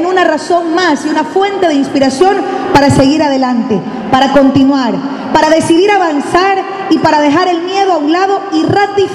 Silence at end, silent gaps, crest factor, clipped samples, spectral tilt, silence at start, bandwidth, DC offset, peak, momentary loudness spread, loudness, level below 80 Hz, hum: 0 s; none; 10 dB; 0.3%; -5 dB/octave; 0 s; 12 kHz; under 0.1%; 0 dBFS; 5 LU; -10 LUFS; -42 dBFS; none